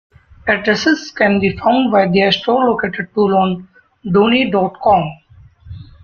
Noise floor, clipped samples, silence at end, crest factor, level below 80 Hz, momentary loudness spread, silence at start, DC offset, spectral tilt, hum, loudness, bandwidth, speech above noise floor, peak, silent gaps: -38 dBFS; under 0.1%; 0.2 s; 14 dB; -46 dBFS; 7 LU; 0.45 s; under 0.1%; -6 dB/octave; none; -14 LUFS; 6.8 kHz; 24 dB; 0 dBFS; none